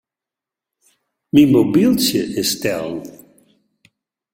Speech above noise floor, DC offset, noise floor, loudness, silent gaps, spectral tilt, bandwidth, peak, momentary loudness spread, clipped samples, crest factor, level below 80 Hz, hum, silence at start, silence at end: 72 dB; under 0.1%; -87 dBFS; -16 LUFS; none; -5 dB/octave; 16.5 kHz; 0 dBFS; 15 LU; under 0.1%; 18 dB; -54 dBFS; none; 1.35 s; 1.25 s